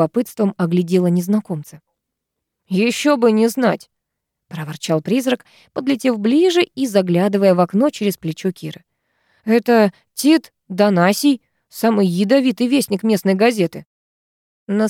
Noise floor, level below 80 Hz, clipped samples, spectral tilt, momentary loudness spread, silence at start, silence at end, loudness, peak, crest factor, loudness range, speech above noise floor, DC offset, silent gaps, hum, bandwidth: -79 dBFS; -68 dBFS; under 0.1%; -6 dB/octave; 13 LU; 0 s; 0 s; -17 LUFS; -2 dBFS; 14 dB; 3 LU; 63 dB; under 0.1%; 13.86-14.66 s; none; 17 kHz